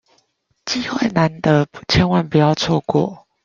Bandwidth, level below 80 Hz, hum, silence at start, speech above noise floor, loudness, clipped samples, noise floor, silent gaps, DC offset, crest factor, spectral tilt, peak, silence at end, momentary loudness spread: 7.4 kHz; -42 dBFS; none; 0.65 s; 47 dB; -18 LUFS; under 0.1%; -64 dBFS; none; under 0.1%; 16 dB; -6 dB/octave; -2 dBFS; 0.3 s; 8 LU